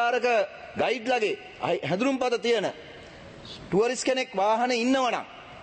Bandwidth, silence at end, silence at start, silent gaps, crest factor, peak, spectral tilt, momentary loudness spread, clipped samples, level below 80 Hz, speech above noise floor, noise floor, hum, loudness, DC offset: 8.8 kHz; 0 s; 0 s; none; 14 dB; -14 dBFS; -4 dB/octave; 19 LU; under 0.1%; -62 dBFS; 19 dB; -45 dBFS; none; -26 LUFS; under 0.1%